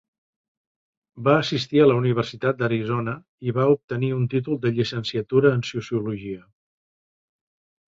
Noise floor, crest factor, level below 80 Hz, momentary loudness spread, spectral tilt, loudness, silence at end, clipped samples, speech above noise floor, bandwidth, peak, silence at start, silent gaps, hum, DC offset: under -90 dBFS; 20 dB; -60 dBFS; 11 LU; -7 dB/octave; -23 LUFS; 1.55 s; under 0.1%; over 68 dB; 7.6 kHz; -4 dBFS; 1.15 s; 3.28-3.38 s, 3.84-3.88 s; none; under 0.1%